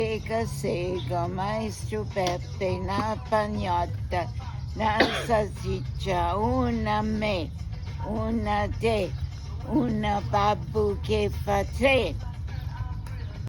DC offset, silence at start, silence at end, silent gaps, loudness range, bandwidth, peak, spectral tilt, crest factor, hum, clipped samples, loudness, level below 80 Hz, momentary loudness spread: under 0.1%; 0 s; 0 s; none; 3 LU; over 20 kHz; -6 dBFS; -6 dB/octave; 20 dB; none; under 0.1%; -28 LUFS; -38 dBFS; 11 LU